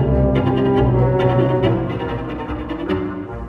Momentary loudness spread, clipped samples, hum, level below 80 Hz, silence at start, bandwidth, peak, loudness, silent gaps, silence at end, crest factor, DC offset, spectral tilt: 10 LU; under 0.1%; none; -28 dBFS; 0 s; 4.7 kHz; -2 dBFS; -18 LUFS; none; 0 s; 16 dB; under 0.1%; -10 dB/octave